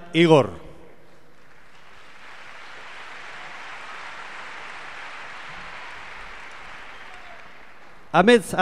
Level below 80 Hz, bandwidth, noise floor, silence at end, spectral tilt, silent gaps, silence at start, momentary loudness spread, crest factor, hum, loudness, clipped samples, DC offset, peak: -58 dBFS; 14 kHz; -53 dBFS; 0 s; -5.5 dB/octave; none; 0.15 s; 26 LU; 24 dB; none; -23 LUFS; under 0.1%; 0.9%; -2 dBFS